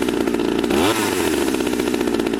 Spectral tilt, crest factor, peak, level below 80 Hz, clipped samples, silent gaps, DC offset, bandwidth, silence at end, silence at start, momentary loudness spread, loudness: -4 dB/octave; 14 dB; -6 dBFS; -42 dBFS; under 0.1%; none; under 0.1%; 16.5 kHz; 0 s; 0 s; 3 LU; -19 LUFS